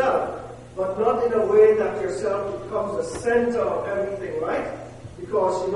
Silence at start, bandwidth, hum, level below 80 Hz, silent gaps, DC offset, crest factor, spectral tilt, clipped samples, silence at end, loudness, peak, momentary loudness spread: 0 s; 11.5 kHz; none; -50 dBFS; none; under 0.1%; 18 dB; -6 dB/octave; under 0.1%; 0 s; -23 LUFS; -6 dBFS; 15 LU